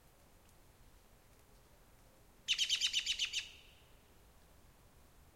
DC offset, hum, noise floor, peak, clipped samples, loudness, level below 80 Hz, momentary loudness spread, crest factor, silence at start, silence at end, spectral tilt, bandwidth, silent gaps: under 0.1%; none; -65 dBFS; -22 dBFS; under 0.1%; -35 LUFS; -68 dBFS; 18 LU; 22 dB; 0.8 s; 0.35 s; 2 dB/octave; 16 kHz; none